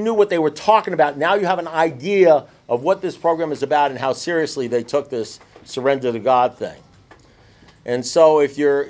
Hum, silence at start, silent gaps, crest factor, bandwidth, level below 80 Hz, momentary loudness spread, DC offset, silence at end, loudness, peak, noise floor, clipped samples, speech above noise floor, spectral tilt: none; 0 s; none; 18 dB; 8 kHz; -60 dBFS; 11 LU; under 0.1%; 0 s; -18 LUFS; 0 dBFS; -49 dBFS; under 0.1%; 32 dB; -5 dB/octave